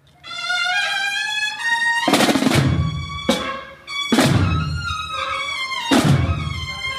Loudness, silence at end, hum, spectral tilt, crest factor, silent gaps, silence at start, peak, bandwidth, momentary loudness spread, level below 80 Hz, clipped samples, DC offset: -19 LUFS; 0 s; none; -4.5 dB/octave; 18 dB; none; 0.25 s; -2 dBFS; 15.5 kHz; 9 LU; -36 dBFS; under 0.1%; under 0.1%